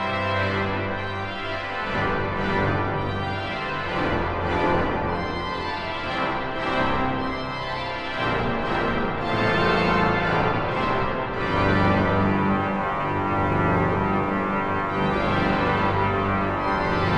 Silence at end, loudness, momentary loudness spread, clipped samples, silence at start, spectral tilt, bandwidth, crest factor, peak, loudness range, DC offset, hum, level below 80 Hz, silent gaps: 0 s; -24 LUFS; 7 LU; under 0.1%; 0 s; -7 dB/octave; 9.4 kHz; 16 dB; -8 dBFS; 4 LU; under 0.1%; none; -40 dBFS; none